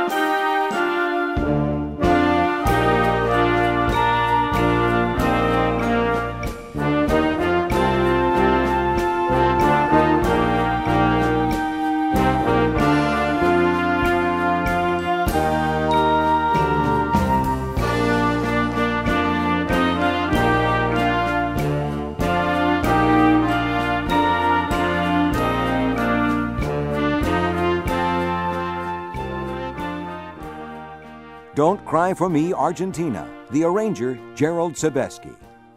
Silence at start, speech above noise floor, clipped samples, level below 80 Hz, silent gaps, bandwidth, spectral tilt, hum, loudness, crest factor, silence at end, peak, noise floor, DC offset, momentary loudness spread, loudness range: 0 s; 18 dB; under 0.1%; -34 dBFS; none; 16 kHz; -6.5 dB/octave; none; -20 LUFS; 16 dB; 0.3 s; -4 dBFS; -40 dBFS; under 0.1%; 8 LU; 5 LU